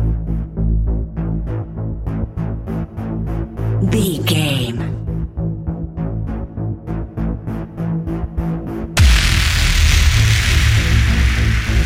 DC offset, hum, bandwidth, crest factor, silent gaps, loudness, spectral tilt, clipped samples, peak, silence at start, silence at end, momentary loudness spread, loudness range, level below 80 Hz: under 0.1%; none; 16 kHz; 16 dB; none; -18 LUFS; -5 dB/octave; under 0.1%; 0 dBFS; 0 s; 0 s; 11 LU; 9 LU; -20 dBFS